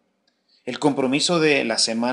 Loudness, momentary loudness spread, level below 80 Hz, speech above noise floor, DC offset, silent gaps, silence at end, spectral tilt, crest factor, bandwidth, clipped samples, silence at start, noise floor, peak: -20 LUFS; 11 LU; -70 dBFS; 48 dB; under 0.1%; none; 0 s; -3.5 dB/octave; 18 dB; 11 kHz; under 0.1%; 0.65 s; -68 dBFS; -4 dBFS